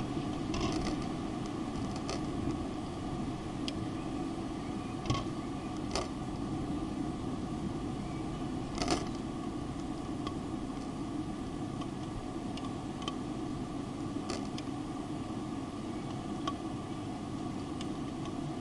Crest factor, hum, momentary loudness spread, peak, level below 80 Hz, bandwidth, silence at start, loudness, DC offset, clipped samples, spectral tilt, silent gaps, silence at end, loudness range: 22 dB; none; 4 LU; -14 dBFS; -50 dBFS; 11.5 kHz; 0 s; -38 LUFS; under 0.1%; under 0.1%; -6 dB/octave; none; 0 s; 2 LU